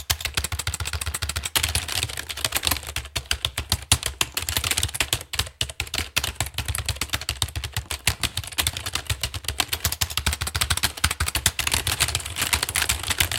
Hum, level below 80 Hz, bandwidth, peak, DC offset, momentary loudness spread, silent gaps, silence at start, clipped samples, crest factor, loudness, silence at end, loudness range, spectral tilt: none; -36 dBFS; 17 kHz; 0 dBFS; under 0.1%; 6 LU; none; 0 s; under 0.1%; 26 dB; -24 LUFS; 0 s; 3 LU; -1.5 dB/octave